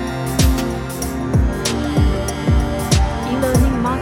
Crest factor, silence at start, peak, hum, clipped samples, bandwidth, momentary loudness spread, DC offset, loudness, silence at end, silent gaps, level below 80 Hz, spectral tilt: 16 dB; 0 s; -2 dBFS; none; under 0.1%; 17 kHz; 6 LU; under 0.1%; -18 LUFS; 0 s; none; -22 dBFS; -5.5 dB/octave